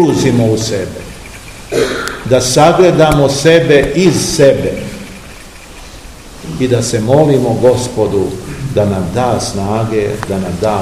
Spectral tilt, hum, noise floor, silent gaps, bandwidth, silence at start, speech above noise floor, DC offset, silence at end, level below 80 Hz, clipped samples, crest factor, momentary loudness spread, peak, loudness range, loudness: -5.5 dB/octave; none; -32 dBFS; none; 16 kHz; 0 s; 21 dB; 0.5%; 0 s; -34 dBFS; 0.8%; 12 dB; 22 LU; 0 dBFS; 5 LU; -11 LUFS